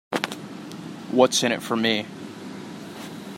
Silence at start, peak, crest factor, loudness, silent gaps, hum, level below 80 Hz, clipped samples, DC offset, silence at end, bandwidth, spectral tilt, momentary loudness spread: 0.1 s; -2 dBFS; 24 dB; -22 LUFS; none; none; -70 dBFS; under 0.1%; under 0.1%; 0 s; 16 kHz; -3.5 dB/octave; 18 LU